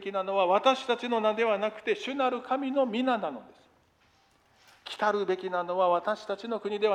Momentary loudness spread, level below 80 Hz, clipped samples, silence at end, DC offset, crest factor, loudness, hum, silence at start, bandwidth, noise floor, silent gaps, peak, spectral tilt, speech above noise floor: 8 LU; -76 dBFS; under 0.1%; 0 s; under 0.1%; 18 dB; -28 LUFS; none; 0 s; 10 kHz; -65 dBFS; none; -10 dBFS; -4.5 dB/octave; 37 dB